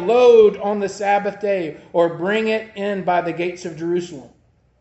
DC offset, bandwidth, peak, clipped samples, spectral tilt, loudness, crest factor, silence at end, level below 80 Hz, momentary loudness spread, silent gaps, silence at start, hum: under 0.1%; 8.2 kHz; -2 dBFS; under 0.1%; -5.5 dB/octave; -18 LUFS; 16 dB; 0.55 s; -60 dBFS; 13 LU; none; 0 s; none